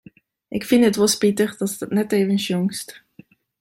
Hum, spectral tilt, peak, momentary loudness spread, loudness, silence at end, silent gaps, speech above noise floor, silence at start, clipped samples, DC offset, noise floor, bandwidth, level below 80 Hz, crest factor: none; -4.5 dB/octave; -4 dBFS; 13 LU; -20 LUFS; 0.65 s; none; 31 dB; 0.5 s; under 0.1%; under 0.1%; -50 dBFS; 16.5 kHz; -62 dBFS; 16 dB